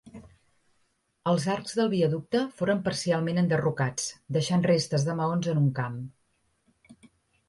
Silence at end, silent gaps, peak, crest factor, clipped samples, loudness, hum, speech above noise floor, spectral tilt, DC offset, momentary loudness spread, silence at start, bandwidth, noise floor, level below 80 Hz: 0.55 s; none; -12 dBFS; 16 dB; under 0.1%; -27 LUFS; none; 46 dB; -6 dB/octave; under 0.1%; 8 LU; 0.05 s; 11.5 kHz; -72 dBFS; -64 dBFS